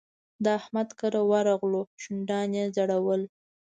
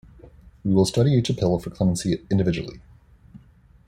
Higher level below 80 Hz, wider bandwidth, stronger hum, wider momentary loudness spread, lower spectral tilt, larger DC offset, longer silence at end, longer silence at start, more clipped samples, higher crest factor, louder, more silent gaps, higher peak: second, -76 dBFS vs -46 dBFS; second, 9.2 kHz vs 14.5 kHz; neither; about the same, 8 LU vs 10 LU; about the same, -6 dB/octave vs -6.5 dB/octave; neither; about the same, 0.5 s vs 0.5 s; second, 0.4 s vs 0.65 s; neither; about the same, 16 dB vs 18 dB; second, -28 LUFS vs -22 LUFS; first, 1.87-1.98 s vs none; second, -12 dBFS vs -6 dBFS